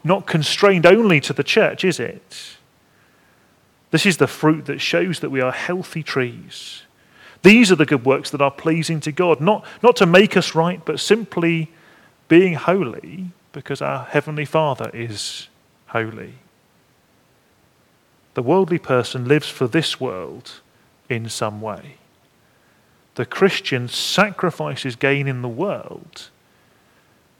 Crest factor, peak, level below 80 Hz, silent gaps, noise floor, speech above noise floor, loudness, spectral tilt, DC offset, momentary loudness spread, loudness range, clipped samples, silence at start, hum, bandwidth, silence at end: 20 dB; 0 dBFS; -64 dBFS; none; -58 dBFS; 40 dB; -18 LUFS; -5 dB/octave; under 0.1%; 20 LU; 9 LU; under 0.1%; 0.05 s; none; 17 kHz; 1.15 s